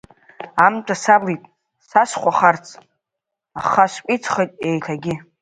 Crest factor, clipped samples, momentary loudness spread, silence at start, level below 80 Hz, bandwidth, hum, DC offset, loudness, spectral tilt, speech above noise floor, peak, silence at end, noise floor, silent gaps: 20 dB; under 0.1%; 11 LU; 0.4 s; -62 dBFS; 9.4 kHz; none; under 0.1%; -18 LUFS; -5 dB/octave; 65 dB; 0 dBFS; 0.2 s; -83 dBFS; none